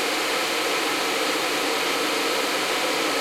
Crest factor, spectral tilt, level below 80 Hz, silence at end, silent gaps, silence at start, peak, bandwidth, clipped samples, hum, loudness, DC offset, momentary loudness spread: 12 dB; -1 dB/octave; -64 dBFS; 0 s; none; 0 s; -10 dBFS; 16.5 kHz; under 0.1%; none; -22 LUFS; under 0.1%; 0 LU